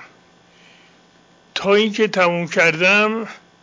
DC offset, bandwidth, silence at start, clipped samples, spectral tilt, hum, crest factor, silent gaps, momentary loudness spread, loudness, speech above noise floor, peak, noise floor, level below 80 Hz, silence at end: under 0.1%; 7.6 kHz; 0 s; under 0.1%; -4.5 dB/octave; none; 14 dB; none; 14 LU; -16 LUFS; 36 dB; -6 dBFS; -52 dBFS; -66 dBFS; 0.25 s